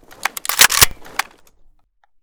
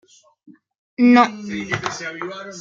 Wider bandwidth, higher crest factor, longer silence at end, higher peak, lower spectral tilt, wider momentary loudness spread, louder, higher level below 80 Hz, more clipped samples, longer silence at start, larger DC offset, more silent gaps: first, over 20 kHz vs 7.6 kHz; about the same, 20 dB vs 20 dB; first, 1 s vs 0 s; about the same, 0 dBFS vs -2 dBFS; second, 0.5 dB/octave vs -5 dB/octave; about the same, 16 LU vs 17 LU; first, -14 LUFS vs -18 LUFS; first, -38 dBFS vs -60 dBFS; first, 0.3% vs under 0.1%; second, 0.25 s vs 0.5 s; neither; second, none vs 0.78-0.97 s